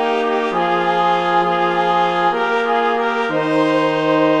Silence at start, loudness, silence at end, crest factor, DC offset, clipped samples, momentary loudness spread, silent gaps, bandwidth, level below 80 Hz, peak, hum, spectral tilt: 0 s; -16 LUFS; 0 s; 14 dB; 0.4%; under 0.1%; 2 LU; none; 10.5 kHz; -60 dBFS; -2 dBFS; none; -6 dB/octave